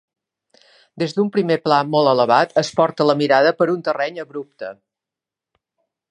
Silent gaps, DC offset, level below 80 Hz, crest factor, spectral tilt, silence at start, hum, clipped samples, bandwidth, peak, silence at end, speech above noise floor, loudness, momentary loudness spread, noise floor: none; under 0.1%; -68 dBFS; 18 dB; -5.5 dB/octave; 0.95 s; none; under 0.1%; 10.5 kHz; 0 dBFS; 1.35 s; 70 dB; -17 LUFS; 16 LU; -87 dBFS